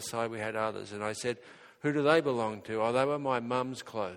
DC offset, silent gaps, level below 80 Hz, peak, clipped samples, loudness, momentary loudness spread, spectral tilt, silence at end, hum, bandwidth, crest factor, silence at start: under 0.1%; none; -72 dBFS; -10 dBFS; under 0.1%; -31 LUFS; 11 LU; -5 dB/octave; 0 s; none; 17 kHz; 22 dB; 0 s